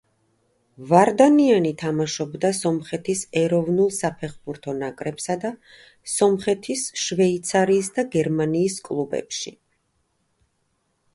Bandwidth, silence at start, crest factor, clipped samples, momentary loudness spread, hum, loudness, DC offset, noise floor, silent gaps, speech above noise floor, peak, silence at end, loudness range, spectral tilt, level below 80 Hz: 11.5 kHz; 0.8 s; 20 dB; under 0.1%; 14 LU; none; -22 LUFS; under 0.1%; -70 dBFS; none; 49 dB; -2 dBFS; 1.65 s; 5 LU; -5 dB/octave; -62 dBFS